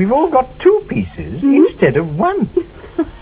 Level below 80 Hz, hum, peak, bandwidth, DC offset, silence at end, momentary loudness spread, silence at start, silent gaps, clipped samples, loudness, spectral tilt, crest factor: -38 dBFS; none; 0 dBFS; 4 kHz; under 0.1%; 0.05 s; 11 LU; 0 s; none; under 0.1%; -15 LUFS; -12 dB/octave; 14 dB